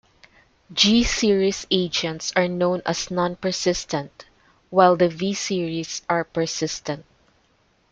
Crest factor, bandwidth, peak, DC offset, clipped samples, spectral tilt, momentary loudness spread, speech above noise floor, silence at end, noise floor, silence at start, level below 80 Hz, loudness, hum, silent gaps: 22 dB; 9.4 kHz; -2 dBFS; under 0.1%; under 0.1%; -4 dB/octave; 12 LU; 41 dB; 0.9 s; -63 dBFS; 0.7 s; -44 dBFS; -22 LUFS; none; none